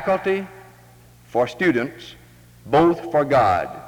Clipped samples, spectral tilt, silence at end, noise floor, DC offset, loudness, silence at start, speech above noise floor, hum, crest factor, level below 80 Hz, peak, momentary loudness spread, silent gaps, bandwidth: under 0.1%; -7 dB/octave; 0 s; -49 dBFS; under 0.1%; -20 LUFS; 0 s; 29 dB; none; 16 dB; -52 dBFS; -6 dBFS; 16 LU; none; 19 kHz